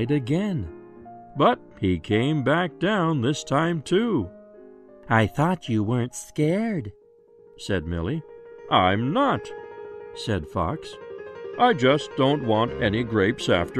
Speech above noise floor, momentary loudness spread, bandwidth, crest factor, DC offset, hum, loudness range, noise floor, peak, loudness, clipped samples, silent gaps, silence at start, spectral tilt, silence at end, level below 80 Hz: 30 dB; 17 LU; 14 kHz; 18 dB; under 0.1%; none; 3 LU; -53 dBFS; -6 dBFS; -24 LUFS; under 0.1%; none; 0 s; -6 dB/octave; 0 s; -50 dBFS